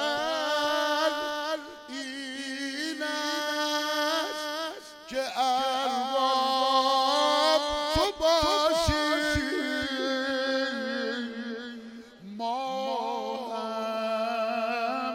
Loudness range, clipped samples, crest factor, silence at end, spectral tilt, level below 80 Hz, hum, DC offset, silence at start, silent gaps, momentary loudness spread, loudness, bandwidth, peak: 8 LU; under 0.1%; 18 dB; 0 s; -3 dB/octave; -50 dBFS; none; under 0.1%; 0 s; none; 12 LU; -28 LUFS; 17.5 kHz; -10 dBFS